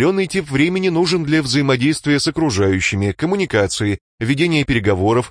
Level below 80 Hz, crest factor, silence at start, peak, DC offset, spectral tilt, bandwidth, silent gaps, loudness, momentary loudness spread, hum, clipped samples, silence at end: -42 dBFS; 16 dB; 0 s; -2 dBFS; under 0.1%; -5 dB/octave; 10.5 kHz; 4.01-4.18 s; -17 LUFS; 4 LU; none; under 0.1%; 0 s